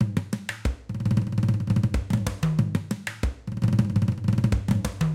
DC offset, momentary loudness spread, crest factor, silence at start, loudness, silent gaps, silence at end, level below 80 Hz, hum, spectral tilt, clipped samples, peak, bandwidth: under 0.1%; 7 LU; 16 dB; 0 s; -26 LUFS; none; 0 s; -36 dBFS; none; -7 dB/octave; under 0.1%; -10 dBFS; 15.5 kHz